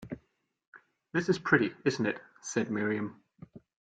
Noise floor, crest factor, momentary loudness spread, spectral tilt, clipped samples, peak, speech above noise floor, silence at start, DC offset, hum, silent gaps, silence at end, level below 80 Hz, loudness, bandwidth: -73 dBFS; 24 dB; 14 LU; -5.5 dB/octave; under 0.1%; -10 dBFS; 42 dB; 0 s; under 0.1%; none; 0.67-0.72 s; 0.4 s; -68 dBFS; -31 LUFS; 9.4 kHz